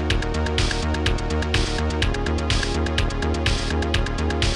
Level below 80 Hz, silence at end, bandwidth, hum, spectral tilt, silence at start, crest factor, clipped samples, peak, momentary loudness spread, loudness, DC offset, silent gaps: -26 dBFS; 0 s; 11.5 kHz; none; -4.5 dB/octave; 0 s; 14 dB; under 0.1%; -8 dBFS; 1 LU; -23 LUFS; 0.2%; none